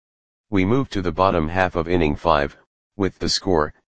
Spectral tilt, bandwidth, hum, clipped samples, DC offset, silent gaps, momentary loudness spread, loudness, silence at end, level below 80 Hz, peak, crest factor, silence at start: -5.5 dB/octave; 9.8 kHz; none; under 0.1%; 2%; 2.66-2.91 s; 6 LU; -21 LUFS; 0.1 s; -38 dBFS; -2 dBFS; 20 dB; 0.45 s